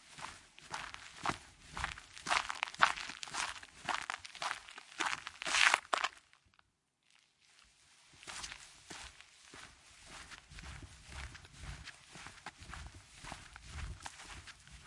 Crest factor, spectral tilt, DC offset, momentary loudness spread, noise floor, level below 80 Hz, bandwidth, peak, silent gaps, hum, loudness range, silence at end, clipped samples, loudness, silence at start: 36 dB; -1 dB/octave; under 0.1%; 20 LU; -78 dBFS; -60 dBFS; 11.5 kHz; -6 dBFS; none; none; 16 LU; 0 s; under 0.1%; -38 LUFS; 0 s